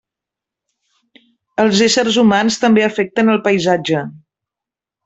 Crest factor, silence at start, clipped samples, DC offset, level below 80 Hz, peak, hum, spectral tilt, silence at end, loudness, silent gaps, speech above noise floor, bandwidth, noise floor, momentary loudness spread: 14 dB; 1.6 s; under 0.1%; under 0.1%; -58 dBFS; -2 dBFS; none; -4.5 dB/octave; 0.9 s; -14 LUFS; none; 73 dB; 8.2 kHz; -87 dBFS; 8 LU